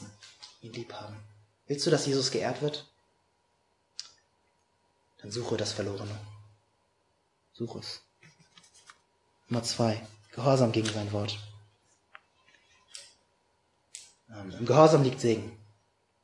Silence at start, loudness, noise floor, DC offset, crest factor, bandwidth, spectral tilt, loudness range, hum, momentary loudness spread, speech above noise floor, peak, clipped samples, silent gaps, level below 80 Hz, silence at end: 0 s; -29 LUFS; -73 dBFS; under 0.1%; 28 dB; 11.5 kHz; -5.5 dB/octave; 14 LU; none; 24 LU; 45 dB; -4 dBFS; under 0.1%; none; -74 dBFS; 0.65 s